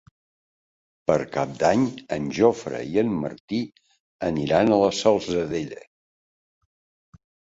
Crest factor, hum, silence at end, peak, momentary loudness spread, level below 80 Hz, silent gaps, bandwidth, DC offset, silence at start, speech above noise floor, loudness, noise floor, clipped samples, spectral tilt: 22 dB; none; 1.75 s; -4 dBFS; 11 LU; -54 dBFS; 3.40-3.48 s, 4.00-4.19 s; 8 kHz; under 0.1%; 1.1 s; over 67 dB; -23 LUFS; under -90 dBFS; under 0.1%; -6 dB/octave